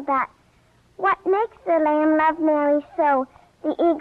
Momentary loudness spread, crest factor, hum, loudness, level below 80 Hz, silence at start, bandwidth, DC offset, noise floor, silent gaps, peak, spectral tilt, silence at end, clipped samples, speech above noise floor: 9 LU; 12 dB; none; -21 LUFS; -62 dBFS; 0 s; 4.7 kHz; under 0.1%; -58 dBFS; none; -10 dBFS; -7 dB/octave; 0 s; under 0.1%; 38 dB